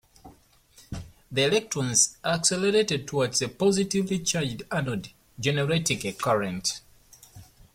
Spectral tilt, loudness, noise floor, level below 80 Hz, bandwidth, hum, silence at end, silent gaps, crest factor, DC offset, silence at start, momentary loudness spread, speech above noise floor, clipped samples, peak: -3.5 dB/octave; -25 LUFS; -57 dBFS; -56 dBFS; 16.5 kHz; none; 0.3 s; none; 20 dB; under 0.1%; 0.25 s; 13 LU; 31 dB; under 0.1%; -8 dBFS